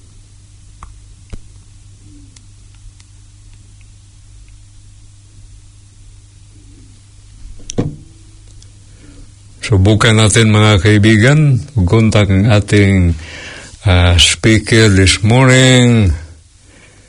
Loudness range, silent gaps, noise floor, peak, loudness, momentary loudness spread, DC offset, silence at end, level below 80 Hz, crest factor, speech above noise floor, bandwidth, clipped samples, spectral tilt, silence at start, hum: 20 LU; none; -43 dBFS; 0 dBFS; -10 LUFS; 15 LU; under 0.1%; 0.8 s; -32 dBFS; 14 dB; 34 dB; 11 kHz; 0.2%; -5 dB/octave; 0.8 s; none